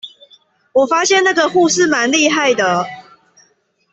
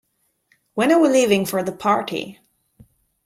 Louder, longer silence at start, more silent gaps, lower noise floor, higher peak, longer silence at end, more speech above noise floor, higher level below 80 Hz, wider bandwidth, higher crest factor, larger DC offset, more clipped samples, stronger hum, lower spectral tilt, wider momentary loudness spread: first, -13 LUFS vs -19 LUFS; second, 0.05 s vs 0.75 s; neither; second, -58 dBFS vs -65 dBFS; about the same, -2 dBFS vs -4 dBFS; about the same, 0.9 s vs 0.9 s; about the same, 45 dB vs 47 dB; about the same, -60 dBFS vs -62 dBFS; second, 8.4 kHz vs 16 kHz; about the same, 14 dB vs 18 dB; neither; neither; neither; second, -2.5 dB/octave vs -4.5 dB/octave; second, 7 LU vs 15 LU